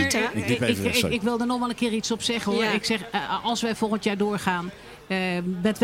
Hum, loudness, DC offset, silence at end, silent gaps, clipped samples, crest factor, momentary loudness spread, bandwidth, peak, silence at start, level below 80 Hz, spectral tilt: none; -25 LUFS; under 0.1%; 0 s; none; under 0.1%; 18 dB; 5 LU; 16.5 kHz; -6 dBFS; 0 s; -54 dBFS; -4 dB/octave